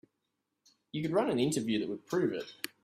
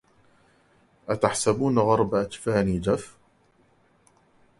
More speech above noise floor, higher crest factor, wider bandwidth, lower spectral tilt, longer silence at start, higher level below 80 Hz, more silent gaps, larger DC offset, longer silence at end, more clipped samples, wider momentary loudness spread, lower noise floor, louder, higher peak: first, 52 dB vs 39 dB; about the same, 18 dB vs 22 dB; first, 16 kHz vs 11.5 kHz; about the same, -5 dB/octave vs -5.5 dB/octave; second, 0.95 s vs 1.1 s; second, -72 dBFS vs -50 dBFS; neither; neither; second, 0.15 s vs 1.5 s; neither; about the same, 10 LU vs 10 LU; first, -84 dBFS vs -62 dBFS; second, -33 LUFS vs -24 LUFS; second, -16 dBFS vs -4 dBFS